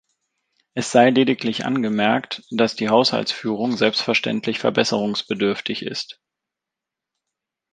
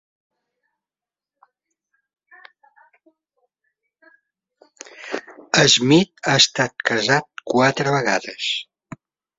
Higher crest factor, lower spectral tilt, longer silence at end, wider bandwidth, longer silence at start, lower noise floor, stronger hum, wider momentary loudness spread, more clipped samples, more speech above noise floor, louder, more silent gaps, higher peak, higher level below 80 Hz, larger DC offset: about the same, 20 dB vs 22 dB; first, -4.5 dB/octave vs -3 dB/octave; first, 1.6 s vs 0.75 s; first, 9.6 kHz vs 8 kHz; second, 0.75 s vs 5 s; second, -86 dBFS vs under -90 dBFS; neither; second, 11 LU vs 17 LU; neither; second, 66 dB vs over 72 dB; second, -20 LUFS vs -17 LUFS; neither; about the same, -2 dBFS vs 0 dBFS; about the same, -66 dBFS vs -62 dBFS; neither